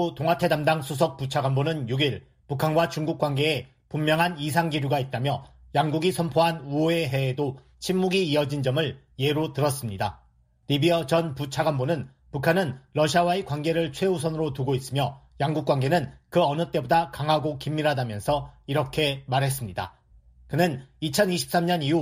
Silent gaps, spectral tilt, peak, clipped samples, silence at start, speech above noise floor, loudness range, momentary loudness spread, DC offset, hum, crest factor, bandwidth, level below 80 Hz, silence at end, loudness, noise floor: none; -5.5 dB/octave; -6 dBFS; under 0.1%; 0 s; 30 dB; 2 LU; 7 LU; under 0.1%; none; 20 dB; 15.5 kHz; -54 dBFS; 0 s; -25 LUFS; -55 dBFS